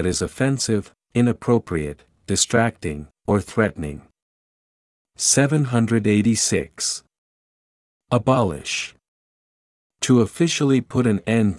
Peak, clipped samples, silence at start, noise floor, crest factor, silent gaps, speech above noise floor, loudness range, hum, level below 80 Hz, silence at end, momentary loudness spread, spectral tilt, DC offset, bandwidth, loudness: -2 dBFS; under 0.1%; 0 s; under -90 dBFS; 20 dB; 4.22-5.05 s, 7.18-8.00 s, 9.08-9.90 s; over 70 dB; 3 LU; none; -50 dBFS; 0 s; 13 LU; -4.5 dB/octave; under 0.1%; 12 kHz; -20 LUFS